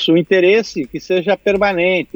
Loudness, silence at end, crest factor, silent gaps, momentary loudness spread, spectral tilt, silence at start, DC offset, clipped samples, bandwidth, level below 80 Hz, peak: -15 LUFS; 0.1 s; 14 dB; none; 8 LU; -5.5 dB/octave; 0 s; under 0.1%; under 0.1%; over 20 kHz; -48 dBFS; -2 dBFS